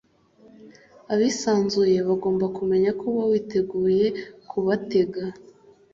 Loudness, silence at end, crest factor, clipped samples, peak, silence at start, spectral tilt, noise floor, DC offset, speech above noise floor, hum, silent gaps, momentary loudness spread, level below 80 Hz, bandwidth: -23 LUFS; 0.5 s; 14 dB; under 0.1%; -10 dBFS; 0.65 s; -6 dB/octave; -55 dBFS; under 0.1%; 33 dB; none; none; 7 LU; -62 dBFS; 7.8 kHz